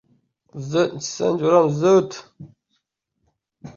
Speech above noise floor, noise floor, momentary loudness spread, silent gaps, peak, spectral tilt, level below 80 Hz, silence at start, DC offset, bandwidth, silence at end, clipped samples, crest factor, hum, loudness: 54 dB; -74 dBFS; 19 LU; none; -4 dBFS; -6 dB/octave; -62 dBFS; 0.55 s; under 0.1%; 7.6 kHz; 0.05 s; under 0.1%; 18 dB; none; -19 LUFS